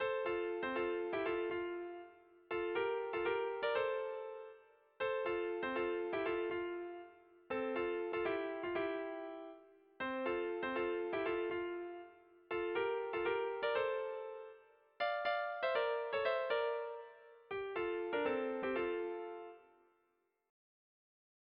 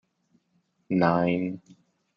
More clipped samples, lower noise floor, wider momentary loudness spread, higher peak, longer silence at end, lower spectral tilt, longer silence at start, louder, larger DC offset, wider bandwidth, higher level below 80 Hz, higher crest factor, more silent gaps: neither; first, -81 dBFS vs -71 dBFS; about the same, 13 LU vs 12 LU; second, -22 dBFS vs -6 dBFS; first, 1.9 s vs 0.6 s; second, -2 dB/octave vs -9 dB/octave; second, 0 s vs 0.9 s; second, -39 LUFS vs -25 LUFS; neither; second, 5.2 kHz vs 6 kHz; second, -74 dBFS vs -66 dBFS; about the same, 18 dB vs 22 dB; neither